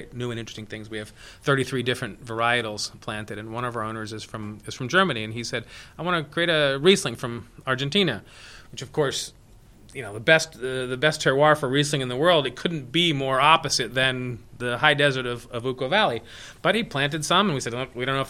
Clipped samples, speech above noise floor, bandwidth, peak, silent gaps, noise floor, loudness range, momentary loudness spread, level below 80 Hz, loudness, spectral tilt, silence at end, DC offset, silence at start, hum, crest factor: under 0.1%; 26 dB; 15.5 kHz; -2 dBFS; none; -50 dBFS; 6 LU; 15 LU; -54 dBFS; -23 LUFS; -4 dB/octave; 0 s; under 0.1%; 0 s; none; 24 dB